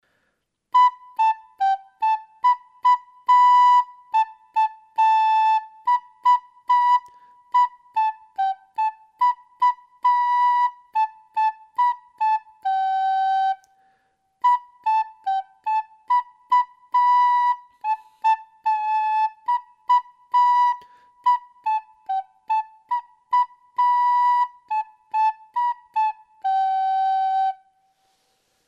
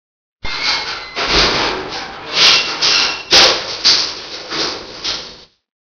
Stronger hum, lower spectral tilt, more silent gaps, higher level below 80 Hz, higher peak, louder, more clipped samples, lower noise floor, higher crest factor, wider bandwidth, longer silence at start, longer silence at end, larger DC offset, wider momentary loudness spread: neither; second, 1.5 dB/octave vs -0.5 dB/octave; neither; second, -84 dBFS vs -38 dBFS; second, -8 dBFS vs 0 dBFS; second, -22 LUFS vs -12 LUFS; second, under 0.1% vs 0.2%; first, -73 dBFS vs -36 dBFS; about the same, 12 dB vs 16 dB; first, 7.4 kHz vs 5.4 kHz; first, 0.75 s vs 0.45 s; first, 1.15 s vs 0.5 s; neither; second, 9 LU vs 17 LU